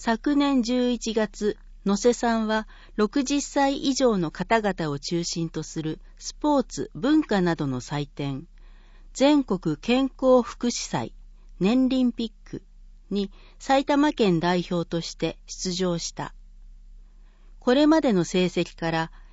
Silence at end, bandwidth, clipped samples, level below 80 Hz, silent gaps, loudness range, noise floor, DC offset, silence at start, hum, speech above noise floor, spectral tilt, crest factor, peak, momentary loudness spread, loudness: 0.1 s; 8 kHz; under 0.1%; -46 dBFS; none; 3 LU; -49 dBFS; under 0.1%; 0 s; none; 25 dB; -5 dB/octave; 18 dB; -8 dBFS; 12 LU; -24 LUFS